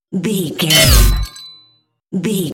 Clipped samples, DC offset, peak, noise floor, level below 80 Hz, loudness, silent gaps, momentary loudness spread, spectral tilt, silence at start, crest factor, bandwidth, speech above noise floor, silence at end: under 0.1%; under 0.1%; 0 dBFS; -56 dBFS; -20 dBFS; -13 LUFS; none; 18 LU; -3.5 dB/octave; 0.1 s; 16 dB; 17.5 kHz; 43 dB; 0 s